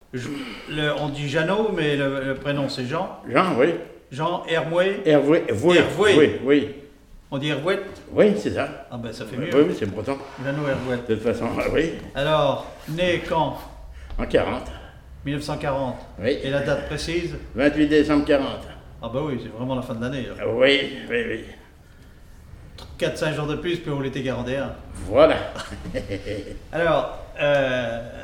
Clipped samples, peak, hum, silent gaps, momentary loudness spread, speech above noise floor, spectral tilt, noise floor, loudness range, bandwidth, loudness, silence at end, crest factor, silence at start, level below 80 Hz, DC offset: under 0.1%; -2 dBFS; none; none; 15 LU; 25 dB; -6 dB/octave; -47 dBFS; 7 LU; 15.5 kHz; -23 LUFS; 0 s; 20 dB; 0.15 s; -42 dBFS; under 0.1%